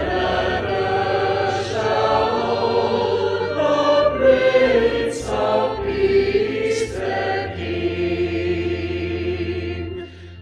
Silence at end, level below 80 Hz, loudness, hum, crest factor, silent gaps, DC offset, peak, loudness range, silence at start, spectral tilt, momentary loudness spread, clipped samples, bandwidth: 0 s; -40 dBFS; -20 LUFS; none; 16 dB; none; under 0.1%; -4 dBFS; 5 LU; 0 s; -5.5 dB/octave; 9 LU; under 0.1%; 11.5 kHz